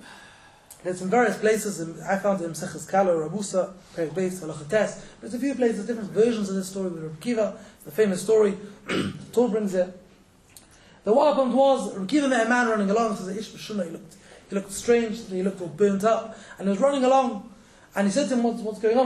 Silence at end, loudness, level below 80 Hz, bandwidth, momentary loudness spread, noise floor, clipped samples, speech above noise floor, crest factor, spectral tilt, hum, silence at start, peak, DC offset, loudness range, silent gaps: 0 s; -25 LUFS; -62 dBFS; 13.5 kHz; 12 LU; -55 dBFS; under 0.1%; 31 dB; 16 dB; -5 dB/octave; none; 0.05 s; -8 dBFS; under 0.1%; 4 LU; none